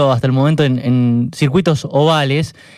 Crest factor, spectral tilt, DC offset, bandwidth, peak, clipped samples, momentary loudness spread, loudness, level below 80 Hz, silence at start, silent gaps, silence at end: 12 dB; -7 dB/octave; under 0.1%; 12.5 kHz; -2 dBFS; under 0.1%; 3 LU; -14 LUFS; -48 dBFS; 0 s; none; 0.25 s